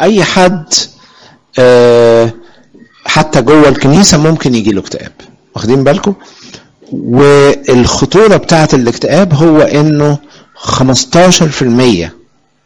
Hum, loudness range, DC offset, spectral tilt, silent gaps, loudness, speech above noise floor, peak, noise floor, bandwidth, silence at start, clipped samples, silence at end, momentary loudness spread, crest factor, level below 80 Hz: none; 3 LU; under 0.1%; -5 dB/octave; none; -7 LUFS; 34 dB; 0 dBFS; -40 dBFS; over 20 kHz; 0 s; 0.4%; 0.55 s; 14 LU; 8 dB; -34 dBFS